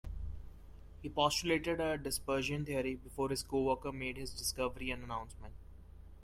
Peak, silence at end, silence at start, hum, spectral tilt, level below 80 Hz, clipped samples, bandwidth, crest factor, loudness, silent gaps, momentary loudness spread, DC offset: -16 dBFS; 0 s; 0.05 s; none; -4 dB/octave; -52 dBFS; under 0.1%; 16 kHz; 22 dB; -37 LUFS; none; 20 LU; under 0.1%